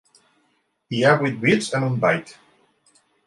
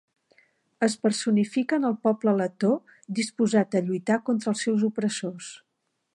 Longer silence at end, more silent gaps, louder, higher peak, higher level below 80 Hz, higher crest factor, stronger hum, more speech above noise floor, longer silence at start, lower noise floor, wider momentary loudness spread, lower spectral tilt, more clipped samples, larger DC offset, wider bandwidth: first, 0.95 s vs 0.6 s; neither; first, -20 LUFS vs -25 LUFS; first, -4 dBFS vs -10 dBFS; first, -64 dBFS vs -76 dBFS; about the same, 20 dB vs 16 dB; neither; second, 48 dB vs 53 dB; about the same, 0.9 s vs 0.8 s; second, -68 dBFS vs -78 dBFS; about the same, 7 LU vs 7 LU; about the same, -5.5 dB/octave vs -5.5 dB/octave; neither; neither; about the same, 11.5 kHz vs 11.5 kHz